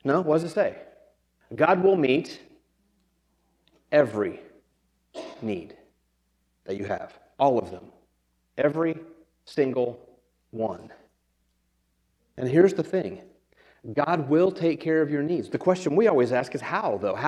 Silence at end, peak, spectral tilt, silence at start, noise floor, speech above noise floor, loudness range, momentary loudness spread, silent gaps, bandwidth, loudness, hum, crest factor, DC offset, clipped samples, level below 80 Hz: 0 s; -4 dBFS; -7 dB/octave; 0.05 s; -71 dBFS; 47 dB; 7 LU; 21 LU; none; 11 kHz; -25 LUFS; none; 22 dB; under 0.1%; under 0.1%; -70 dBFS